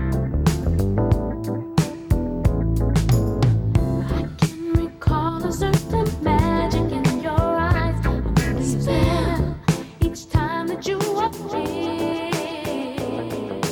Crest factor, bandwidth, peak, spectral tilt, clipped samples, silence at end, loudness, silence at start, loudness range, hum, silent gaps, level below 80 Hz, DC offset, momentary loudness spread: 16 dB; 19.5 kHz; -4 dBFS; -6.5 dB/octave; under 0.1%; 0 s; -22 LUFS; 0 s; 3 LU; none; none; -28 dBFS; under 0.1%; 6 LU